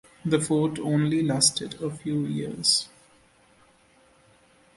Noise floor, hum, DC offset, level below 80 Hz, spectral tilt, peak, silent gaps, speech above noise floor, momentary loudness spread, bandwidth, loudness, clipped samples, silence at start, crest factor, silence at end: -59 dBFS; none; under 0.1%; -62 dBFS; -4 dB/octave; -4 dBFS; none; 34 dB; 10 LU; 11.5 kHz; -24 LUFS; under 0.1%; 0.25 s; 24 dB; 1.9 s